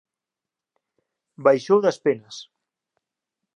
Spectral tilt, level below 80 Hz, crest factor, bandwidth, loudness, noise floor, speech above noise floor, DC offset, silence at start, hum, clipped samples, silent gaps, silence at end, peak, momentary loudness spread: -5.5 dB/octave; -78 dBFS; 22 dB; 10 kHz; -21 LUFS; -88 dBFS; 68 dB; under 0.1%; 1.4 s; none; under 0.1%; none; 1.15 s; -4 dBFS; 20 LU